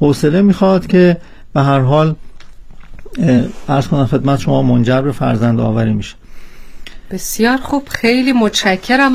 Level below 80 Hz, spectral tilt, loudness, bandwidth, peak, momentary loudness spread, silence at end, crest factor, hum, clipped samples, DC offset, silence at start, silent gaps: -34 dBFS; -6 dB/octave; -13 LUFS; 16 kHz; 0 dBFS; 10 LU; 0 s; 12 dB; none; under 0.1%; under 0.1%; 0 s; none